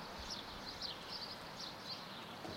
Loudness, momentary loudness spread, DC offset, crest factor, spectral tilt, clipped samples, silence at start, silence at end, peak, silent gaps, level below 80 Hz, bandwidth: -46 LUFS; 3 LU; under 0.1%; 16 dB; -3 dB/octave; under 0.1%; 0 s; 0 s; -32 dBFS; none; -64 dBFS; 16 kHz